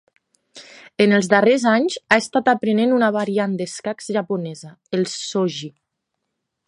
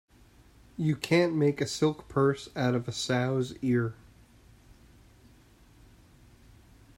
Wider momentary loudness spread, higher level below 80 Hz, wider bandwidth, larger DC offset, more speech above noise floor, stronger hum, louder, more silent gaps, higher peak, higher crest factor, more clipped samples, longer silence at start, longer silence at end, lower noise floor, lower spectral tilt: first, 13 LU vs 6 LU; second, -68 dBFS vs -60 dBFS; second, 11 kHz vs 16 kHz; neither; first, 59 dB vs 30 dB; neither; first, -19 LUFS vs -28 LUFS; neither; first, 0 dBFS vs -12 dBFS; about the same, 20 dB vs 20 dB; neither; second, 0.55 s vs 0.8 s; second, 1 s vs 3.05 s; first, -78 dBFS vs -58 dBFS; about the same, -5 dB/octave vs -6 dB/octave